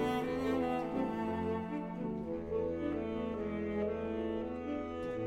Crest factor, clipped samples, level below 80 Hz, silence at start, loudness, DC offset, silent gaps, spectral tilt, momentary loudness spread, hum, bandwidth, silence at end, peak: 14 dB; under 0.1%; -56 dBFS; 0 s; -37 LUFS; under 0.1%; none; -7.5 dB/octave; 5 LU; none; 16 kHz; 0 s; -22 dBFS